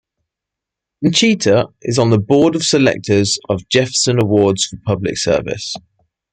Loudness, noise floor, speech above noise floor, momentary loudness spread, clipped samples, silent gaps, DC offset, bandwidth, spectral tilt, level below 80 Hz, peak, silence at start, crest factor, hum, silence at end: -15 LUFS; -83 dBFS; 68 dB; 7 LU; under 0.1%; none; under 0.1%; 9.6 kHz; -4.5 dB/octave; -50 dBFS; -2 dBFS; 1 s; 14 dB; none; 0.55 s